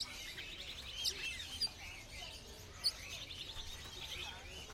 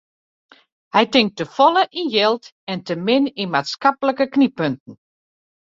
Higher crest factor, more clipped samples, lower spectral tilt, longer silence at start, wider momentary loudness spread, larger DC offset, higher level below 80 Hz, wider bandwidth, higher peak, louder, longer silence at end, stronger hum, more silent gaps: about the same, 22 dB vs 18 dB; neither; second, -1 dB/octave vs -5.5 dB/octave; second, 0 s vs 0.95 s; about the same, 11 LU vs 11 LU; neither; first, -58 dBFS vs -66 dBFS; first, 16.5 kHz vs 7.6 kHz; second, -24 dBFS vs -2 dBFS; second, -43 LUFS vs -19 LUFS; second, 0 s vs 0.7 s; neither; second, none vs 2.52-2.67 s, 4.80-4.86 s